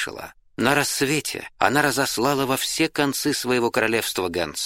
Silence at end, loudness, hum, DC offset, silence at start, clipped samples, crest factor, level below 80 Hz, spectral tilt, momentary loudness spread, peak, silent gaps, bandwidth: 0 s; -22 LUFS; none; under 0.1%; 0 s; under 0.1%; 22 dB; -54 dBFS; -3 dB/octave; 6 LU; -2 dBFS; none; 16.5 kHz